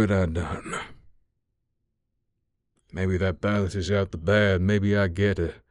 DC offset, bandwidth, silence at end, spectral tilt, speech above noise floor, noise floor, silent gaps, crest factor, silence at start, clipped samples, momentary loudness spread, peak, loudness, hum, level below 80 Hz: under 0.1%; 11 kHz; 0.15 s; -7 dB/octave; 53 dB; -77 dBFS; none; 16 dB; 0 s; under 0.1%; 12 LU; -10 dBFS; -25 LUFS; none; -44 dBFS